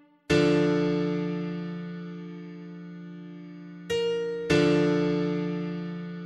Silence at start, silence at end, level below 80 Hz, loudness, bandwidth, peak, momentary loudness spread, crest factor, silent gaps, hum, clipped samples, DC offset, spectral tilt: 0.3 s; 0 s; -56 dBFS; -27 LUFS; 11.5 kHz; -10 dBFS; 19 LU; 18 dB; none; none; under 0.1%; under 0.1%; -6.5 dB/octave